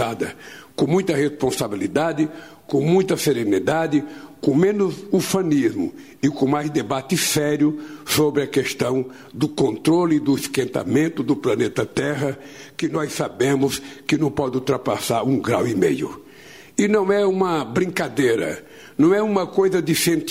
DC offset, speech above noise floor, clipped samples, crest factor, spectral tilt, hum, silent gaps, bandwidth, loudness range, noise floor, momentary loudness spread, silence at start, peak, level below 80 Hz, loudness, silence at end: 0.2%; 24 dB; under 0.1%; 14 dB; -5 dB/octave; none; none; 16 kHz; 2 LU; -44 dBFS; 9 LU; 0 s; -6 dBFS; -56 dBFS; -21 LUFS; 0 s